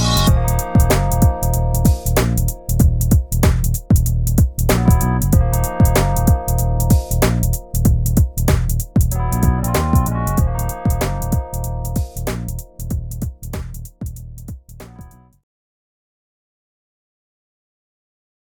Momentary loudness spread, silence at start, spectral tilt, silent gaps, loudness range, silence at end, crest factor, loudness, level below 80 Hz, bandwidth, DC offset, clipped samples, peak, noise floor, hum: 14 LU; 0 s; -6 dB/octave; none; 14 LU; 3.45 s; 16 dB; -17 LUFS; -22 dBFS; 19.5 kHz; 0.7%; under 0.1%; 0 dBFS; -41 dBFS; none